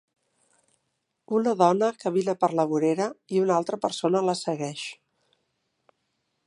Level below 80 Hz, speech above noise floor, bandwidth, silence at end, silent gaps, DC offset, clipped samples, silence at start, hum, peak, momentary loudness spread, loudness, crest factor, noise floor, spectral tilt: -78 dBFS; 53 dB; 11.5 kHz; 1.55 s; none; under 0.1%; under 0.1%; 1.3 s; none; -6 dBFS; 9 LU; -25 LUFS; 22 dB; -78 dBFS; -5.5 dB/octave